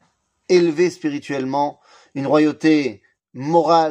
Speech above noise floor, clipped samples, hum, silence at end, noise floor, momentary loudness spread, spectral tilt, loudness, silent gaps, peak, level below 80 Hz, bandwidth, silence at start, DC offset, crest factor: 27 dB; under 0.1%; none; 0 s; -45 dBFS; 12 LU; -6 dB/octave; -19 LUFS; none; -2 dBFS; -70 dBFS; 9 kHz; 0.5 s; under 0.1%; 16 dB